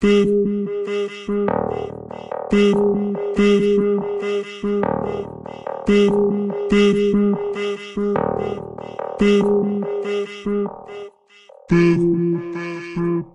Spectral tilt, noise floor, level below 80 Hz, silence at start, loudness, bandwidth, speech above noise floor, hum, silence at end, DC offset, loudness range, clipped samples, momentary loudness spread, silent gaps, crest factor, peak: -7 dB/octave; -48 dBFS; -44 dBFS; 0 s; -19 LUFS; 10 kHz; 29 dB; none; 0.05 s; under 0.1%; 3 LU; under 0.1%; 14 LU; none; 14 dB; -4 dBFS